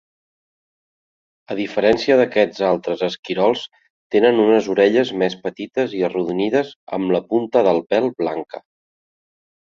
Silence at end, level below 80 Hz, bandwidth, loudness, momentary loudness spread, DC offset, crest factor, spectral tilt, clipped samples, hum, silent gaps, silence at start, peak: 1.15 s; -60 dBFS; 7.4 kHz; -19 LUFS; 11 LU; under 0.1%; 18 dB; -6 dB/octave; under 0.1%; none; 3.19-3.23 s, 3.90-4.10 s, 6.76-6.87 s; 1.5 s; -2 dBFS